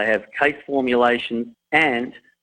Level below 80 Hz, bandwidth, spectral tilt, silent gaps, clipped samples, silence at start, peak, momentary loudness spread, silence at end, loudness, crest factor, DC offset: -58 dBFS; 9.6 kHz; -5.5 dB/octave; none; under 0.1%; 0 s; -2 dBFS; 9 LU; 0.3 s; -20 LUFS; 18 dB; under 0.1%